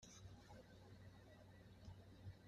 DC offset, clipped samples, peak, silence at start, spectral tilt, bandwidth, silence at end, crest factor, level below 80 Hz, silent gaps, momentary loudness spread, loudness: under 0.1%; under 0.1%; -46 dBFS; 0 s; -5 dB/octave; 13.5 kHz; 0 s; 14 dB; -72 dBFS; none; 4 LU; -63 LUFS